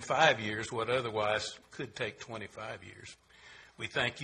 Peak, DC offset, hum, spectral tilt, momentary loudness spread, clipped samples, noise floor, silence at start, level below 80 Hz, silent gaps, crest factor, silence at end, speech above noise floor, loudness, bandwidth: -10 dBFS; under 0.1%; none; -3.5 dB/octave; 25 LU; under 0.1%; -56 dBFS; 0 s; -66 dBFS; none; 24 dB; 0 s; 22 dB; -33 LUFS; 11.5 kHz